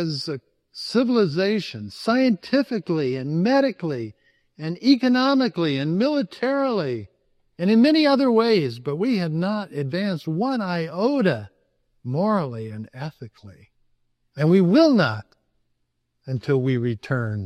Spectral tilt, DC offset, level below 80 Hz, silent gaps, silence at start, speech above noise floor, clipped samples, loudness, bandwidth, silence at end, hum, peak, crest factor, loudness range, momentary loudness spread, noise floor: -7 dB/octave; under 0.1%; -66 dBFS; none; 0 s; 52 dB; under 0.1%; -21 LUFS; 12 kHz; 0 s; none; -4 dBFS; 18 dB; 4 LU; 16 LU; -73 dBFS